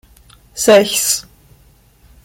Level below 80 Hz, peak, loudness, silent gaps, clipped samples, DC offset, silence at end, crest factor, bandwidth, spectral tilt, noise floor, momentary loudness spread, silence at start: -50 dBFS; 0 dBFS; -13 LUFS; none; under 0.1%; under 0.1%; 1.05 s; 16 dB; 16.5 kHz; -2 dB/octave; -49 dBFS; 11 LU; 0.55 s